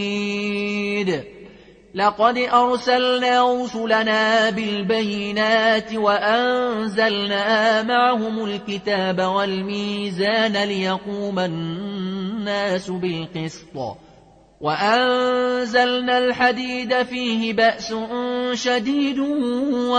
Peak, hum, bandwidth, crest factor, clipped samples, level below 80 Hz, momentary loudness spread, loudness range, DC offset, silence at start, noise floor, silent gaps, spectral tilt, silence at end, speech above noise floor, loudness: -4 dBFS; none; 9.4 kHz; 16 dB; under 0.1%; -58 dBFS; 9 LU; 5 LU; under 0.1%; 0 s; -50 dBFS; none; -4.5 dB/octave; 0 s; 30 dB; -20 LUFS